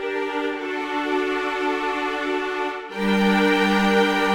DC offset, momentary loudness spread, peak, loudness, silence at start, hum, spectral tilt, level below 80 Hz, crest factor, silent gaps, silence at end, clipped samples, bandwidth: under 0.1%; 8 LU; -6 dBFS; -22 LUFS; 0 s; none; -5.5 dB/octave; -52 dBFS; 16 dB; none; 0 s; under 0.1%; 17.5 kHz